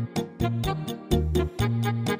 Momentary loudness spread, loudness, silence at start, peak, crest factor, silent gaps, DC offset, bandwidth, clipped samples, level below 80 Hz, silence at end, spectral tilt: 5 LU; -27 LUFS; 0 s; -10 dBFS; 16 dB; none; under 0.1%; 16 kHz; under 0.1%; -36 dBFS; 0 s; -6.5 dB/octave